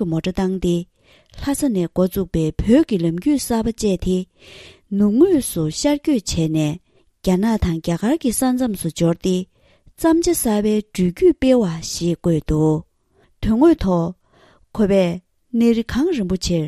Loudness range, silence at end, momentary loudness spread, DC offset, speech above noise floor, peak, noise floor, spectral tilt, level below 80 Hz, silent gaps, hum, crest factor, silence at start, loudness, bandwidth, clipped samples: 2 LU; 0 s; 9 LU; under 0.1%; 41 dB; -2 dBFS; -59 dBFS; -6 dB/octave; -36 dBFS; none; none; 16 dB; 0 s; -19 LUFS; 14.5 kHz; under 0.1%